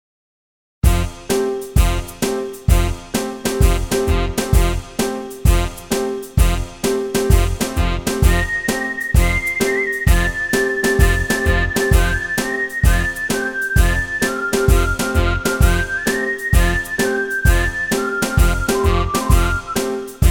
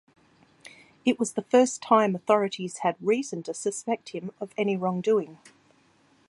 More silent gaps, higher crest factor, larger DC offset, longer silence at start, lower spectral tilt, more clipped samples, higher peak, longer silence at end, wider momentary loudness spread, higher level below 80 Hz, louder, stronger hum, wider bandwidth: neither; about the same, 16 dB vs 20 dB; neither; first, 0.85 s vs 0.65 s; about the same, -5 dB/octave vs -5 dB/octave; neither; first, 0 dBFS vs -6 dBFS; second, 0 s vs 0.95 s; second, 5 LU vs 11 LU; first, -20 dBFS vs -76 dBFS; first, -18 LUFS vs -26 LUFS; neither; first, 18.5 kHz vs 11.5 kHz